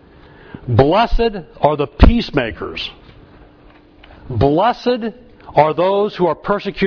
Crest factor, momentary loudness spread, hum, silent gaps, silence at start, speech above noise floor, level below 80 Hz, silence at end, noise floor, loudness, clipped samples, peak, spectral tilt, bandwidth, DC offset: 16 dB; 12 LU; none; none; 0.55 s; 31 dB; -24 dBFS; 0 s; -45 dBFS; -16 LUFS; under 0.1%; 0 dBFS; -8 dB/octave; 5.4 kHz; under 0.1%